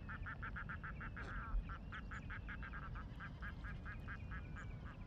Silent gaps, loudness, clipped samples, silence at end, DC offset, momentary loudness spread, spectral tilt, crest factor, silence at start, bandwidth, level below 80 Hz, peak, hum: none; -50 LUFS; under 0.1%; 0 s; under 0.1%; 3 LU; -7 dB/octave; 16 dB; 0 s; 7.6 kHz; -50 dBFS; -32 dBFS; none